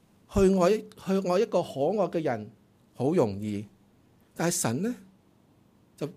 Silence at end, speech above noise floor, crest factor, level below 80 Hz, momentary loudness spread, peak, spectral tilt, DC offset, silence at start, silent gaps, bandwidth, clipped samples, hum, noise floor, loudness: 0.05 s; 35 dB; 18 dB; -50 dBFS; 14 LU; -12 dBFS; -5.5 dB/octave; under 0.1%; 0.3 s; none; 15.5 kHz; under 0.1%; none; -62 dBFS; -28 LUFS